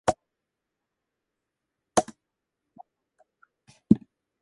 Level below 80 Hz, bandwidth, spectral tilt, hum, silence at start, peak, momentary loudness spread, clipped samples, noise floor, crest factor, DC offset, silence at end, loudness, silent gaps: -58 dBFS; 11.5 kHz; -5.5 dB/octave; none; 0.05 s; -2 dBFS; 15 LU; under 0.1%; -84 dBFS; 30 dB; under 0.1%; 0.45 s; -27 LUFS; none